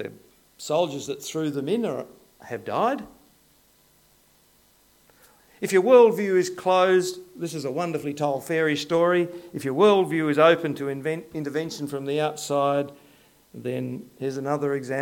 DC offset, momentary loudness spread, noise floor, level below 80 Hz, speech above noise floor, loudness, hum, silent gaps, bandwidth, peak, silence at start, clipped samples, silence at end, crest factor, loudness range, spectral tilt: under 0.1%; 15 LU; -60 dBFS; -68 dBFS; 37 dB; -24 LUFS; none; none; 17.5 kHz; -4 dBFS; 0 s; under 0.1%; 0 s; 20 dB; 9 LU; -5 dB/octave